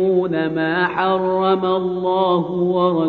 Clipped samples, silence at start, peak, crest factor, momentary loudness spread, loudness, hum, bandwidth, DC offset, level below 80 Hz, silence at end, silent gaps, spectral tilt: under 0.1%; 0 s; -4 dBFS; 14 dB; 3 LU; -18 LUFS; none; 4.7 kHz; under 0.1%; -58 dBFS; 0 s; none; -5 dB/octave